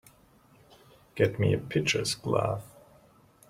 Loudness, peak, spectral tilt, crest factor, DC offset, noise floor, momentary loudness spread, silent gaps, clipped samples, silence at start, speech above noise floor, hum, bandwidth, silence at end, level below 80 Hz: -28 LUFS; -10 dBFS; -5 dB/octave; 20 dB; under 0.1%; -60 dBFS; 8 LU; none; under 0.1%; 1.15 s; 32 dB; none; 16 kHz; 0.85 s; -60 dBFS